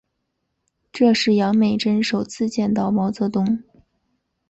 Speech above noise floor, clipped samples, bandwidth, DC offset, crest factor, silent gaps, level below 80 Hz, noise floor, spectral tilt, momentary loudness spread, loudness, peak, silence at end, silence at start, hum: 56 dB; under 0.1%; 8.2 kHz; under 0.1%; 16 dB; none; -58 dBFS; -75 dBFS; -6 dB/octave; 7 LU; -20 LUFS; -6 dBFS; 0.9 s; 0.95 s; none